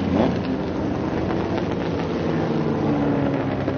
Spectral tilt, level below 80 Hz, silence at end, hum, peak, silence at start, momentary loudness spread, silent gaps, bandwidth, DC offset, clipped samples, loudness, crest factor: -7 dB/octave; -42 dBFS; 0 s; none; -6 dBFS; 0 s; 4 LU; none; 6.8 kHz; under 0.1%; under 0.1%; -23 LUFS; 16 dB